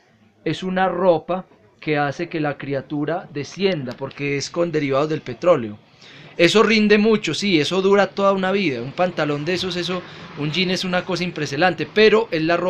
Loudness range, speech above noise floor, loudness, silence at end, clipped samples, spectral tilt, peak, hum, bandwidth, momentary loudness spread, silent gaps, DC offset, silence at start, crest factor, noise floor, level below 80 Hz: 6 LU; 24 dB; -20 LUFS; 0 s; under 0.1%; -5 dB/octave; 0 dBFS; none; 11 kHz; 12 LU; none; under 0.1%; 0.45 s; 20 dB; -44 dBFS; -54 dBFS